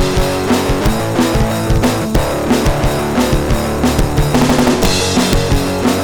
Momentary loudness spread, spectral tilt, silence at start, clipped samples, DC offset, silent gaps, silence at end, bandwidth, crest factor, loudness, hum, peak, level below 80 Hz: 3 LU; -5 dB/octave; 0 s; under 0.1%; under 0.1%; none; 0 s; 19 kHz; 10 dB; -14 LUFS; none; -4 dBFS; -20 dBFS